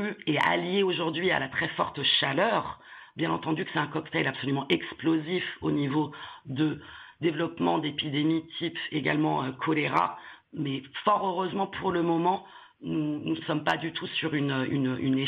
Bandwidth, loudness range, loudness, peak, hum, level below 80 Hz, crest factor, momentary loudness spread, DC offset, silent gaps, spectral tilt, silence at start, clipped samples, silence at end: 7.4 kHz; 2 LU; -28 LUFS; -10 dBFS; none; -66 dBFS; 18 dB; 8 LU; under 0.1%; none; -7.5 dB/octave; 0 s; under 0.1%; 0 s